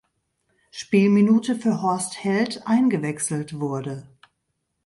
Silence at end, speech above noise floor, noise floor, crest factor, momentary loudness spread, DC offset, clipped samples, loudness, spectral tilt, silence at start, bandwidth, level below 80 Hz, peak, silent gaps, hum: 0.8 s; 55 dB; -76 dBFS; 16 dB; 15 LU; under 0.1%; under 0.1%; -22 LUFS; -5.5 dB/octave; 0.75 s; 11.5 kHz; -66 dBFS; -6 dBFS; none; none